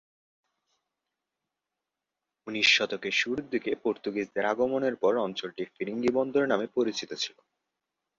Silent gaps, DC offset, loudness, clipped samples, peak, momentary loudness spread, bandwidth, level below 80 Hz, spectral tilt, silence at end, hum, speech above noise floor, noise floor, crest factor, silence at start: none; under 0.1%; -28 LUFS; under 0.1%; -8 dBFS; 11 LU; 7.8 kHz; -72 dBFS; -3.5 dB/octave; 0.9 s; none; 59 dB; -88 dBFS; 22 dB; 2.45 s